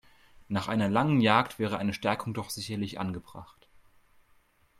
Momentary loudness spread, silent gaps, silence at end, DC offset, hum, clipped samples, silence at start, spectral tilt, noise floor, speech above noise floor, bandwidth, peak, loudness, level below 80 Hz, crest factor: 13 LU; none; 1.35 s; under 0.1%; none; under 0.1%; 0.5 s; -6 dB/octave; -65 dBFS; 36 dB; 15.5 kHz; -8 dBFS; -29 LUFS; -62 dBFS; 22 dB